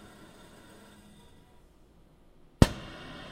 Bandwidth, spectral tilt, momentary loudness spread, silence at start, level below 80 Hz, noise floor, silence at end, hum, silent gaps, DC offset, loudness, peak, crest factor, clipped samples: 16 kHz; -6 dB/octave; 27 LU; 2.6 s; -42 dBFS; -59 dBFS; 0.5 s; none; none; under 0.1%; -28 LUFS; 0 dBFS; 34 dB; under 0.1%